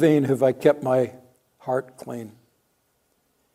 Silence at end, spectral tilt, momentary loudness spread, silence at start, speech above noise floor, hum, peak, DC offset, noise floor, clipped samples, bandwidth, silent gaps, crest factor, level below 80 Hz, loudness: 1.25 s; -7.5 dB/octave; 17 LU; 0 s; 48 dB; none; -4 dBFS; under 0.1%; -69 dBFS; under 0.1%; 16 kHz; none; 20 dB; -72 dBFS; -22 LUFS